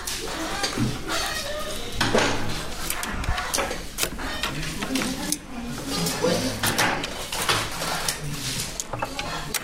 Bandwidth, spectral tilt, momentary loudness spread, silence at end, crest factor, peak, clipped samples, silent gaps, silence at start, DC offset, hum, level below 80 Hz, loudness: 16 kHz; -3 dB/octave; 7 LU; 0 s; 24 dB; -4 dBFS; under 0.1%; none; 0 s; under 0.1%; none; -38 dBFS; -26 LUFS